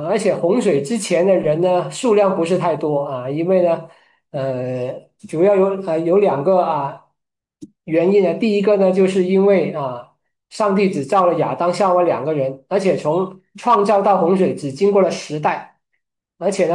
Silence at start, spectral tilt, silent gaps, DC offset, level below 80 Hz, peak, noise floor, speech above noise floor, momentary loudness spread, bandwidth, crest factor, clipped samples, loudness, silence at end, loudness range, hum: 0 s; -6.5 dB/octave; none; under 0.1%; -66 dBFS; -4 dBFS; -79 dBFS; 63 dB; 10 LU; 11.5 kHz; 14 dB; under 0.1%; -17 LUFS; 0 s; 2 LU; none